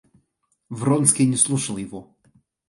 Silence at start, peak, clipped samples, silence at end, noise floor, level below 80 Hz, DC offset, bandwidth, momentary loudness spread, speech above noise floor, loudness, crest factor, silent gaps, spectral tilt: 0.7 s; 0 dBFS; under 0.1%; 0.65 s; -71 dBFS; -62 dBFS; under 0.1%; 11.5 kHz; 20 LU; 50 dB; -19 LUFS; 22 dB; none; -4.5 dB/octave